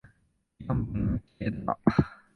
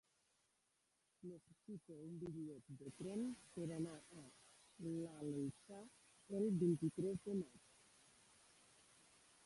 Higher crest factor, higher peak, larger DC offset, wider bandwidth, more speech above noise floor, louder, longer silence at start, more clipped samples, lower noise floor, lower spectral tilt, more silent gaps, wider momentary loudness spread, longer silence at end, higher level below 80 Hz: about the same, 24 dB vs 20 dB; first, -6 dBFS vs -28 dBFS; neither; second, 6.2 kHz vs 11.5 kHz; about the same, 41 dB vs 38 dB; first, -30 LUFS vs -47 LUFS; second, 0.6 s vs 1.25 s; neither; second, -69 dBFS vs -84 dBFS; first, -9.5 dB/octave vs -7.5 dB/octave; neither; second, 8 LU vs 26 LU; second, 0.2 s vs 1.85 s; first, -44 dBFS vs -80 dBFS